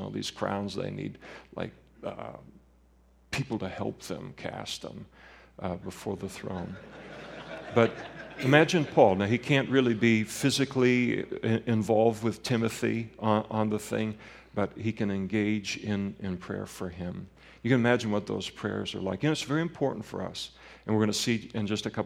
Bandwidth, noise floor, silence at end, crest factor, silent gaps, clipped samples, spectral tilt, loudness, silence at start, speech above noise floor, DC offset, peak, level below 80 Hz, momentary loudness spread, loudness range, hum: 16.5 kHz; -61 dBFS; 0 s; 26 dB; none; under 0.1%; -5.5 dB/octave; -29 LUFS; 0 s; 32 dB; under 0.1%; -4 dBFS; -60 dBFS; 17 LU; 13 LU; none